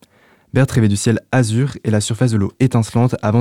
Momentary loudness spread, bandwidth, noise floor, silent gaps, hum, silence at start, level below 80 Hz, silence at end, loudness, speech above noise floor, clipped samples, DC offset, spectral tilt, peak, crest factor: 3 LU; 15 kHz; -52 dBFS; none; none; 0.55 s; -46 dBFS; 0 s; -17 LUFS; 37 dB; under 0.1%; under 0.1%; -6.5 dB/octave; -2 dBFS; 14 dB